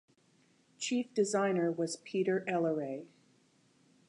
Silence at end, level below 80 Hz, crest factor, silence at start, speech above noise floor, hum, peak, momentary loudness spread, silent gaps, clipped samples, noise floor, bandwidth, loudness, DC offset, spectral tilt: 1 s; -88 dBFS; 16 dB; 0.8 s; 36 dB; none; -18 dBFS; 9 LU; none; under 0.1%; -69 dBFS; 11.5 kHz; -33 LUFS; under 0.1%; -5 dB/octave